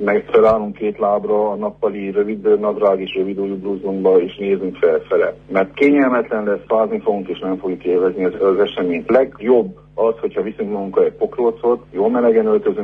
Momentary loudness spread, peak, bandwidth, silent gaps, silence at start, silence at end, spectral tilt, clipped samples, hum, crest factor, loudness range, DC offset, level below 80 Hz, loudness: 8 LU; -2 dBFS; 4.4 kHz; none; 0 s; 0 s; -8.5 dB/octave; under 0.1%; 50 Hz at -50 dBFS; 16 dB; 1 LU; under 0.1%; -52 dBFS; -17 LUFS